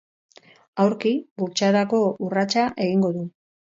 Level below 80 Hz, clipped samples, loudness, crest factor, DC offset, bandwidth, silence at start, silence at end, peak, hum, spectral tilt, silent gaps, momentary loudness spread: -66 dBFS; under 0.1%; -22 LUFS; 16 dB; under 0.1%; 7.8 kHz; 0.75 s; 0.5 s; -8 dBFS; none; -5.5 dB/octave; 1.31-1.36 s; 8 LU